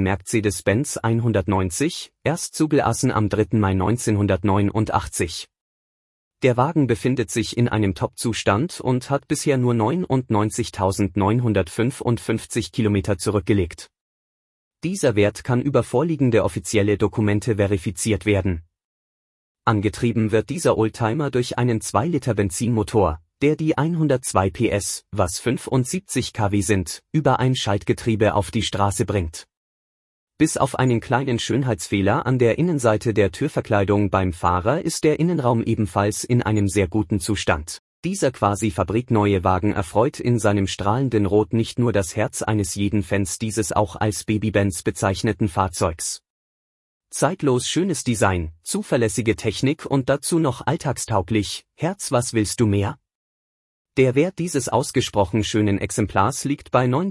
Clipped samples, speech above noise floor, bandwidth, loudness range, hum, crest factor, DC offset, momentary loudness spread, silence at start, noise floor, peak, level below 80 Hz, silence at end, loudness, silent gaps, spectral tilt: under 0.1%; over 70 dB; 12 kHz; 3 LU; none; 18 dB; under 0.1%; 5 LU; 0 s; under -90 dBFS; -4 dBFS; -48 dBFS; 0 s; -21 LUFS; 5.61-6.31 s, 14.01-14.71 s, 18.84-19.55 s, 29.57-30.27 s, 37.79-38.03 s, 46.30-47.01 s, 53.15-53.85 s; -5.5 dB/octave